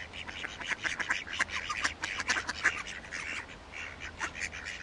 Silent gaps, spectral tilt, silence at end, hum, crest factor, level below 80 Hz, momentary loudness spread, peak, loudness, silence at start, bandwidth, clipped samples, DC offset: none; -1 dB/octave; 0 s; none; 24 dB; -56 dBFS; 10 LU; -12 dBFS; -34 LUFS; 0 s; 11.5 kHz; under 0.1%; under 0.1%